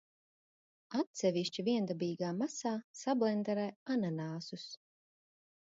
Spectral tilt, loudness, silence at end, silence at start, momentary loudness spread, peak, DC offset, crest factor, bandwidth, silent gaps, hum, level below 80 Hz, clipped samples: -5.5 dB/octave; -36 LUFS; 0.9 s; 0.9 s; 10 LU; -20 dBFS; under 0.1%; 18 dB; 7.6 kHz; 1.07-1.14 s, 2.84-2.94 s, 3.76-3.86 s; none; -84 dBFS; under 0.1%